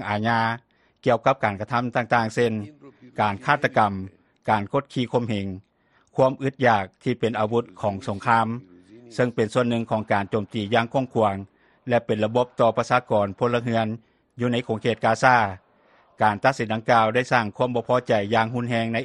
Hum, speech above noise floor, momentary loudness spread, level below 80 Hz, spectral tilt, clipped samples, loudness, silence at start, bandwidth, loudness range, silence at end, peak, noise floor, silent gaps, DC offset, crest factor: none; 36 dB; 9 LU; -60 dBFS; -6.5 dB/octave; under 0.1%; -23 LUFS; 0 s; 11.5 kHz; 3 LU; 0 s; -2 dBFS; -59 dBFS; none; under 0.1%; 22 dB